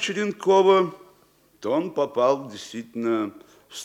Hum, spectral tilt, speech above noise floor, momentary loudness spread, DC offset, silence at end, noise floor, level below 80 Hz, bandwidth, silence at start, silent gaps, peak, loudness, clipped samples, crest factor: none; -5 dB/octave; 37 dB; 17 LU; under 0.1%; 0 s; -59 dBFS; -74 dBFS; 12 kHz; 0 s; none; -6 dBFS; -23 LUFS; under 0.1%; 16 dB